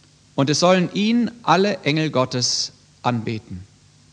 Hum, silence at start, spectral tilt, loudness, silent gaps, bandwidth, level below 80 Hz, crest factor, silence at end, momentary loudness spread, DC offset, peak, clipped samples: none; 0.35 s; -4.5 dB/octave; -20 LUFS; none; 10 kHz; -60 dBFS; 18 dB; 0.5 s; 13 LU; under 0.1%; -2 dBFS; under 0.1%